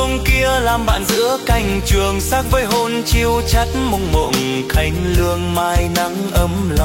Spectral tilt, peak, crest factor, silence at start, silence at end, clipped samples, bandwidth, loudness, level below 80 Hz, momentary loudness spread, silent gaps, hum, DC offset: -4.5 dB/octave; -2 dBFS; 14 dB; 0 s; 0 s; under 0.1%; 16.5 kHz; -16 LUFS; -22 dBFS; 3 LU; none; none; under 0.1%